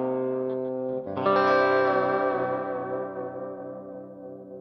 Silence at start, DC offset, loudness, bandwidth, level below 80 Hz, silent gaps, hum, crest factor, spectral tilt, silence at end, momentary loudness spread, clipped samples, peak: 0 s; under 0.1%; -26 LUFS; 6.2 kHz; -72 dBFS; none; none; 18 dB; -7.5 dB/octave; 0 s; 20 LU; under 0.1%; -10 dBFS